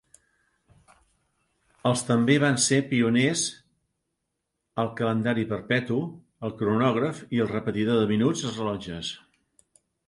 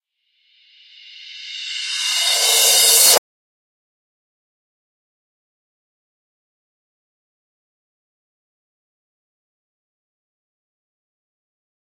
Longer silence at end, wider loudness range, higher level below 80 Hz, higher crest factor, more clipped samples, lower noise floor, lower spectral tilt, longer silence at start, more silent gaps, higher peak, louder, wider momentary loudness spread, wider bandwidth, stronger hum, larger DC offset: second, 0.9 s vs 8.8 s; about the same, 3 LU vs 3 LU; first, -60 dBFS vs -86 dBFS; about the same, 20 dB vs 24 dB; neither; first, -81 dBFS vs -65 dBFS; first, -5 dB/octave vs 3.5 dB/octave; first, 1.85 s vs 1.2 s; neither; second, -8 dBFS vs 0 dBFS; second, -25 LUFS vs -12 LUFS; second, 12 LU vs 19 LU; second, 11.5 kHz vs 16.5 kHz; neither; neither